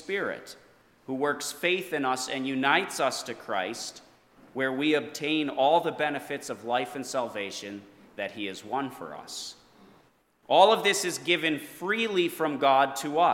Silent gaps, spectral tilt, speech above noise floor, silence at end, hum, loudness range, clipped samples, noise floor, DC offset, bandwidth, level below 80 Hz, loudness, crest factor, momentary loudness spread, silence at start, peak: none; -3 dB/octave; 36 dB; 0 s; none; 9 LU; under 0.1%; -63 dBFS; under 0.1%; 17.5 kHz; -76 dBFS; -27 LUFS; 22 dB; 15 LU; 0 s; -6 dBFS